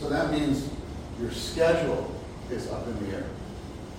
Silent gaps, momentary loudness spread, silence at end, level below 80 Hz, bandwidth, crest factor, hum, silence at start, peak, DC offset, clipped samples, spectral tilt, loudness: none; 15 LU; 0 s; -44 dBFS; 16 kHz; 18 dB; none; 0 s; -10 dBFS; under 0.1%; under 0.1%; -5.5 dB/octave; -30 LUFS